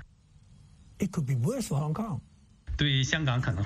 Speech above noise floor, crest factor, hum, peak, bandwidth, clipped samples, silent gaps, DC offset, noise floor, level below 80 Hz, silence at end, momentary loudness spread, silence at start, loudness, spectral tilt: 29 dB; 20 dB; none; -10 dBFS; 15 kHz; under 0.1%; none; under 0.1%; -57 dBFS; -46 dBFS; 0 s; 10 LU; 0 s; -30 LUFS; -5 dB/octave